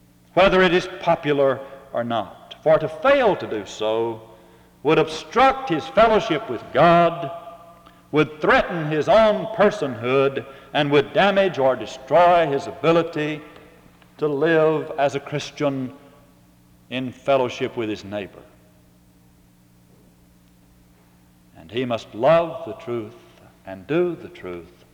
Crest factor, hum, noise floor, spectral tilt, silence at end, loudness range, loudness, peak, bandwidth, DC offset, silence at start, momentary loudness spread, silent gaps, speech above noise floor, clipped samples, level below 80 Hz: 20 dB; none; -54 dBFS; -6 dB/octave; 0.3 s; 9 LU; -20 LUFS; -2 dBFS; 12 kHz; under 0.1%; 0.35 s; 15 LU; none; 34 dB; under 0.1%; -52 dBFS